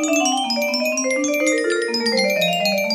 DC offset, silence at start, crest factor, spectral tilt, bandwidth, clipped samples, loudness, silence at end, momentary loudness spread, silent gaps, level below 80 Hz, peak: under 0.1%; 0 s; 14 dB; -2.5 dB/octave; 15.5 kHz; under 0.1%; -19 LUFS; 0 s; 2 LU; none; -68 dBFS; -6 dBFS